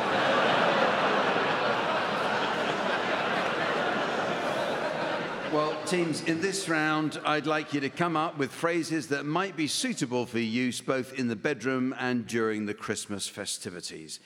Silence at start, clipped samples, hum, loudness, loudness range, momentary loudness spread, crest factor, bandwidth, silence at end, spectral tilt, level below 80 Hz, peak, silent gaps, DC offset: 0 s; under 0.1%; none; -28 LUFS; 4 LU; 7 LU; 18 dB; 17 kHz; 0.1 s; -4 dB/octave; -72 dBFS; -12 dBFS; none; under 0.1%